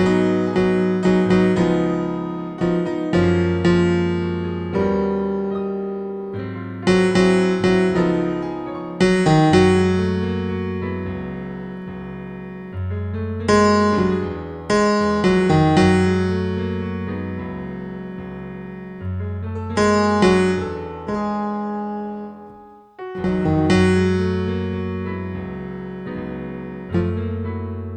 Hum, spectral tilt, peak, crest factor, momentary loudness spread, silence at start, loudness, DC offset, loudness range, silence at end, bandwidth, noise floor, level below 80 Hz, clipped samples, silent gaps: none; -7 dB/octave; -2 dBFS; 18 dB; 15 LU; 0 s; -20 LUFS; under 0.1%; 8 LU; 0 s; 9.6 kHz; -43 dBFS; -44 dBFS; under 0.1%; none